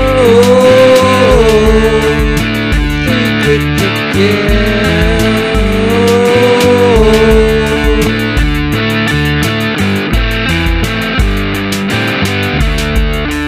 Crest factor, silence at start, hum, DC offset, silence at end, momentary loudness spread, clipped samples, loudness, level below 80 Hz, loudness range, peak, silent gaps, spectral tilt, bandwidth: 8 dB; 0 s; none; under 0.1%; 0 s; 6 LU; 0.5%; -10 LUFS; -18 dBFS; 4 LU; 0 dBFS; none; -5.5 dB/octave; 16 kHz